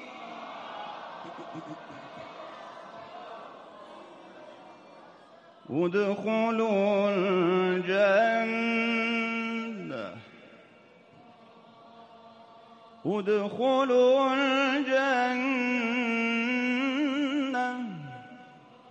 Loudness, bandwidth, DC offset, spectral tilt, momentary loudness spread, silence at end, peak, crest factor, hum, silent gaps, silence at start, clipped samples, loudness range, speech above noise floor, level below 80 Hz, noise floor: -27 LUFS; 8.4 kHz; under 0.1%; -5.5 dB/octave; 21 LU; 0.3 s; -14 dBFS; 16 dB; none; none; 0 s; under 0.1%; 19 LU; 30 dB; -78 dBFS; -56 dBFS